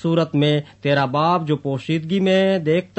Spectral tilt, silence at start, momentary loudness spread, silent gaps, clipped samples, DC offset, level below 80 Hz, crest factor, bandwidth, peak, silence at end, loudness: -7.5 dB/octave; 0 s; 6 LU; none; under 0.1%; under 0.1%; -60 dBFS; 14 dB; 8.4 kHz; -4 dBFS; 0.15 s; -19 LUFS